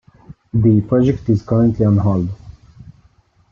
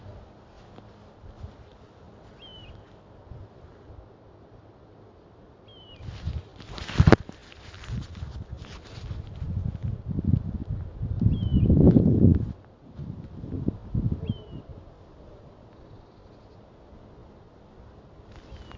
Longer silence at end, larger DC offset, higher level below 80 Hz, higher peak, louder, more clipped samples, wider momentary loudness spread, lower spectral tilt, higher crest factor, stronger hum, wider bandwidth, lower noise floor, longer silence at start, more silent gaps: first, 1 s vs 0 s; neither; second, -42 dBFS vs -36 dBFS; second, -4 dBFS vs 0 dBFS; first, -16 LUFS vs -26 LUFS; neither; second, 9 LU vs 29 LU; first, -10.5 dB/octave vs -8.5 dB/octave; second, 14 dB vs 28 dB; neither; second, 6.6 kHz vs 7.6 kHz; about the same, -54 dBFS vs -52 dBFS; first, 0.3 s vs 0.05 s; neither